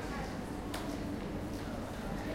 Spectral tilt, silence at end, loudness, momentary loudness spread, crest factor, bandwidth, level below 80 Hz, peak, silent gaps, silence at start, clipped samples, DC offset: -5.5 dB/octave; 0 s; -40 LUFS; 2 LU; 16 dB; 16.5 kHz; -48 dBFS; -24 dBFS; none; 0 s; under 0.1%; under 0.1%